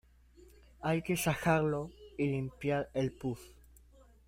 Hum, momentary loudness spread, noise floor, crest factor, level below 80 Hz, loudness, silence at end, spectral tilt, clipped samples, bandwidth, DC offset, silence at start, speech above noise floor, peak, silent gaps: none; 11 LU; -61 dBFS; 20 dB; -58 dBFS; -34 LUFS; 0.75 s; -6 dB/octave; under 0.1%; 16 kHz; under 0.1%; 0.8 s; 27 dB; -16 dBFS; none